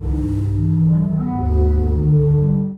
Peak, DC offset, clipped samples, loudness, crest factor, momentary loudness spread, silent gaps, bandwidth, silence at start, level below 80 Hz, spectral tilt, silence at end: -6 dBFS; under 0.1%; under 0.1%; -17 LUFS; 10 dB; 5 LU; none; 2.3 kHz; 0 s; -22 dBFS; -12 dB/octave; 0 s